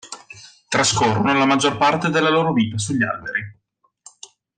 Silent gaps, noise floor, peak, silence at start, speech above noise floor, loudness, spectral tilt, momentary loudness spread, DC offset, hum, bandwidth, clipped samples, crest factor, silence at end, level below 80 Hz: none; -50 dBFS; -6 dBFS; 0.05 s; 32 dB; -18 LUFS; -4 dB/octave; 10 LU; under 0.1%; none; 10 kHz; under 0.1%; 14 dB; 1.05 s; -56 dBFS